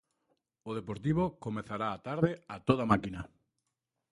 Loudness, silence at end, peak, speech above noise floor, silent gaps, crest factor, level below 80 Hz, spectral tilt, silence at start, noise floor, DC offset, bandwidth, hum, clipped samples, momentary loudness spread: -33 LUFS; 0.85 s; -10 dBFS; 53 dB; none; 26 dB; -58 dBFS; -8 dB/octave; 0.65 s; -86 dBFS; under 0.1%; 11.5 kHz; none; under 0.1%; 13 LU